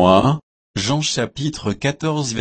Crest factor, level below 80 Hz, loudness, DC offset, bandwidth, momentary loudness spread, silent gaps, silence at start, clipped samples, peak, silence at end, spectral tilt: 18 dB; -46 dBFS; -20 LUFS; under 0.1%; 8.8 kHz; 9 LU; 0.43-0.74 s; 0 s; under 0.1%; 0 dBFS; 0 s; -5 dB/octave